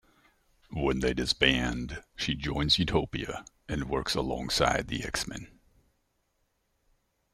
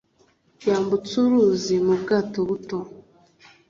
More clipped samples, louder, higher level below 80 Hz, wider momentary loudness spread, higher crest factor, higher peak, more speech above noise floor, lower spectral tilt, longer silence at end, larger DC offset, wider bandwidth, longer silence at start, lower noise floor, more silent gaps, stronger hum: neither; second, -29 LUFS vs -22 LUFS; first, -44 dBFS vs -60 dBFS; about the same, 13 LU vs 12 LU; first, 24 dB vs 14 dB; about the same, -6 dBFS vs -8 dBFS; first, 46 dB vs 41 dB; second, -4 dB/octave vs -6 dB/octave; first, 1.85 s vs 0.7 s; neither; first, 16 kHz vs 7.4 kHz; about the same, 0.7 s vs 0.6 s; first, -75 dBFS vs -62 dBFS; neither; neither